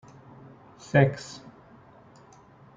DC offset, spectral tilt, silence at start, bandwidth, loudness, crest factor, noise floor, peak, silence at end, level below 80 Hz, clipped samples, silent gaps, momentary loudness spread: under 0.1%; -7 dB/octave; 0.95 s; 7.6 kHz; -25 LUFS; 24 dB; -53 dBFS; -6 dBFS; 1.4 s; -62 dBFS; under 0.1%; none; 27 LU